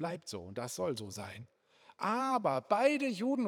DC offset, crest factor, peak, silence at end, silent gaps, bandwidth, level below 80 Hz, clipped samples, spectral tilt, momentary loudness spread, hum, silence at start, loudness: under 0.1%; 20 dB; -14 dBFS; 0 s; none; 18 kHz; -82 dBFS; under 0.1%; -5 dB/octave; 14 LU; none; 0 s; -34 LUFS